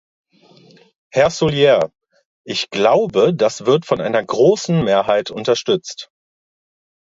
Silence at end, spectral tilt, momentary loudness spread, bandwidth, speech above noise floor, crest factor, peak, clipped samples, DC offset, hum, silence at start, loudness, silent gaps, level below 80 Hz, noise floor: 1.1 s; -5 dB/octave; 9 LU; 7.8 kHz; 33 dB; 16 dB; 0 dBFS; under 0.1%; under 0.1%; none; 1.15 s; -16 LUFS; 2.25-2.44 s; -54 dBFS; -49 dBFS